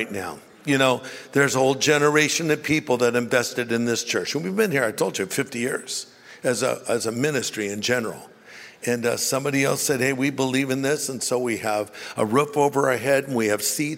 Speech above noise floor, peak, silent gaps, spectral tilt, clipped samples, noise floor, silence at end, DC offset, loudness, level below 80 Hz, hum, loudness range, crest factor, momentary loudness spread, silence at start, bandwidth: 22 dB; -4 dBFS; none; -3.5 dB/octave; under 0.1%; -45 dBFS; 0 s; under 0.1%; -22 LUFS; -66 dBFS; none; 5 LU; 20 dB; 9 LU; 0 s; 16 kHz